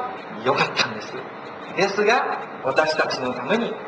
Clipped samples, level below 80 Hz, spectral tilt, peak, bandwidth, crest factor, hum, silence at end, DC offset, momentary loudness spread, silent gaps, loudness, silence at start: under 0.1%; -64 dBFS; -4 dB/octave; -4 dBFS; 8 kHz; 20 dB; none; 0 s; under 0.1%; 13 LU; none; -22 LUFS; 0 s